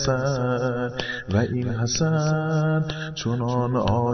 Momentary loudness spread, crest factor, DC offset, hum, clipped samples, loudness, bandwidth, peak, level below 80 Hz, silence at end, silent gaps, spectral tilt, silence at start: 5 LU; 16 dB; under 0.1%; none; under 0.1%; -24 LUFS; 6.4 kHz; -6 dBFS; -46 dBFS; 0 s; none; -5.5 dB/octave; 0 s